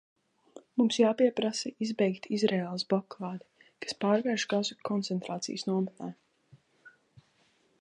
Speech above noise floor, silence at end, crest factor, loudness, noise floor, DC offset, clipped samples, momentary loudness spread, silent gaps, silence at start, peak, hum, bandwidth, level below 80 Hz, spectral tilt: 39 dB; 0.9 s; 20 dB; -30 LUFS; -69 dBFS; under 0.1%; under 0.1%; 14 LU; none; 0.55 s; -12 dBFS; none; 10.5 kHz; -80 dBFS; -5 dB/octave